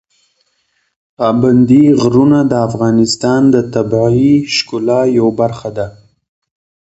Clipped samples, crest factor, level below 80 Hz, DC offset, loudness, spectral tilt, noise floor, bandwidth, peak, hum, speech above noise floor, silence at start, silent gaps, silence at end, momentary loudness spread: under 0.1%; 12 dB; -46 dBFS; under 0.1%; -11 LUFS; -6.5 dB/octave; -62 dBFS; 8.2 kHz; 0 dBFS; none; 51 dB; 1.2 s; none; 1.05 s; 9 LU